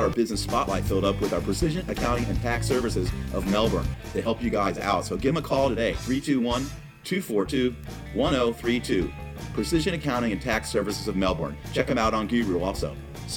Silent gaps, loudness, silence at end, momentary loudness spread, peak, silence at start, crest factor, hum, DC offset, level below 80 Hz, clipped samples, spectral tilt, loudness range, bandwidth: none; -26 LUFS; 0 s; 7 LU; -8 dBFS; 0 s; 18 dB; none; under 0.1%; -38 dBFS; under 0.1%; -5.5 dB/octave; 1 LU; 19.5 kHz